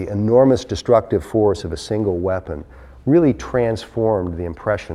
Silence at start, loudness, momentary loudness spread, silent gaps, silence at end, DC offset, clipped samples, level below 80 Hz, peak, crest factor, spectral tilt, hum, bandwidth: 0 s; -19 LUFS; 11 LU; none; 0 s; under 0.1%; under 0.1%; -40 dBFS; -2 dBFS; 16 dB; -7.5 dB/octave; none; 12 kHz